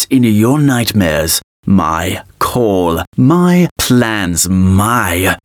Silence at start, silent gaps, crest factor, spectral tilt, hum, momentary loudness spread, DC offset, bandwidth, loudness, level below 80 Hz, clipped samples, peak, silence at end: 0 s; 1.43-1.63 s, 3.07-3.12 s, 3.71-3.76 s; 12 dB; -5 dB/octave; none; 5 LU; under 0.1%; 19.5 kHz; -12 LUFS; -38 dBFS; under 0.1%; 0 dBFS; 0.1 s